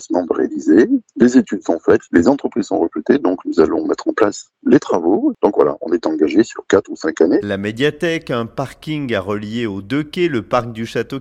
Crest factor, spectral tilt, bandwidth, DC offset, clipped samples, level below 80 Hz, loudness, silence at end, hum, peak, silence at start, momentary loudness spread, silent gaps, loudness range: 16 dB; -6 dB/octave; 10.5 kHz; under 0.1%; under 0.1%; -50 dBFS; -17 LUFS; 0 s; none; 0 dBFS; 0 s; 9 LU; none; 5 LU